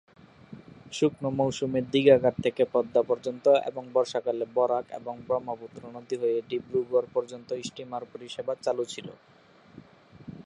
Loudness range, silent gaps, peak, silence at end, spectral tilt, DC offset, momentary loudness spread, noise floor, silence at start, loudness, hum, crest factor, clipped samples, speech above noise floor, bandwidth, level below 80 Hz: 7 LU; none; -8 dBFS; 0.05 s; -5.5 dB/octave; under 0.1%; 16 LU; -52 dBFS; 0.5 s; -27 LUFS; none; 20 dB; under 0.1%; 25 dB; 10.5 kHz; -66 dBFS